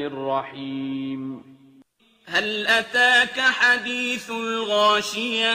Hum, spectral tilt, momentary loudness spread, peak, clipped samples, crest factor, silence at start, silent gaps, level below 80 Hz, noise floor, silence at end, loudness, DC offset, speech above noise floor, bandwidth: none; -2 dB/octave; 14 LU; -6 dBFS; under 0.1%; 18 dB; 0 s; none; -66 dBFS; -57 dBFS; 0 s; -21 LUFS; under 0.1%; 35 dB; 15.5 kHz